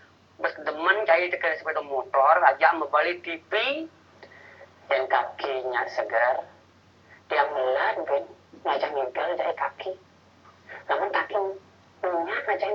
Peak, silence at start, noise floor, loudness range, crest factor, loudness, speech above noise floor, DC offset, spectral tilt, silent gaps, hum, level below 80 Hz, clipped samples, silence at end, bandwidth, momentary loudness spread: -2 dBFS; 0.4 s; -56 dBFS; 7 LU; 24 dB; -25 LUFS; 31 dB; under 0.1%; -4.5 dB/octave; none; none; -78 dBFS; under 0.1%; 0 s; 7 kHz; 12 LU